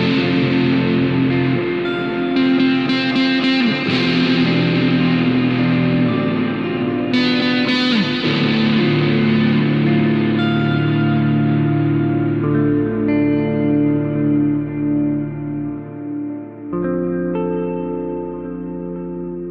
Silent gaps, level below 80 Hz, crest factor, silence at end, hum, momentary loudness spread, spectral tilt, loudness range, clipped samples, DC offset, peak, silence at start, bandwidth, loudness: none; -46 dBFS; 12 dB; 0 s; none; 10 LU; -8 dB/octave; 6 LU; under 0.1%; under 0.1%; -4 dBFS; 0 s; 7.2 kHz; -17 LUFS